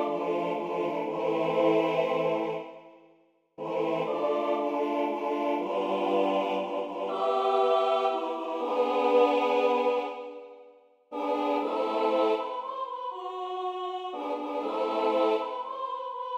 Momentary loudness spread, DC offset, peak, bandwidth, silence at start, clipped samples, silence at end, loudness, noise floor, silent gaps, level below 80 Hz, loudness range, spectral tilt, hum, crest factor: 10 LU; under 0.1%; -12 dBFS; 8.6 kHz; 0 s; under 0.1%; 0 s; -28 LUFS; -64 dBFS; none; -80 dBFS; 5 LU; -6 dB/octave; none; 18 dB